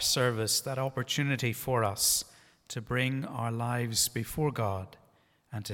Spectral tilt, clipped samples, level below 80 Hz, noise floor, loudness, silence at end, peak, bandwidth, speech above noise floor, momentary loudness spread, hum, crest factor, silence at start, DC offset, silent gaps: -3.5 dB/octave; under 0.1%; -58 dBFS; -66 dBFS; -30 LUFS; 0 s; -12 dBFS; 18 kHz; 35 dB; 15 LU; none; 18 dB; 0 s; under 0.1%; none